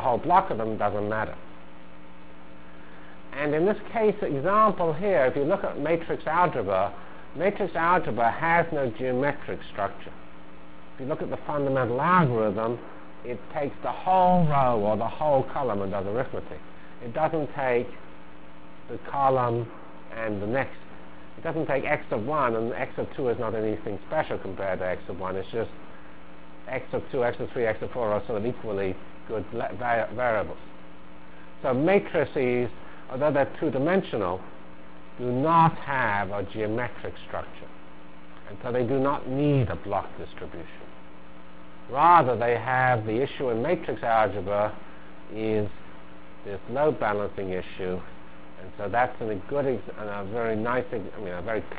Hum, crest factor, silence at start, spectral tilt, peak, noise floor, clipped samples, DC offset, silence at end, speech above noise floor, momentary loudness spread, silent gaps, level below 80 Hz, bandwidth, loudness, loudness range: none; 22 dB; 0 s; -10.5 dB/octave; -6 dBFS; -48 dBFS; under 0.1%; 2%; 0 s; 22 dB; 21 LU; none; -52 dBFS; 4 kHz; -26 LUFS; 6 LU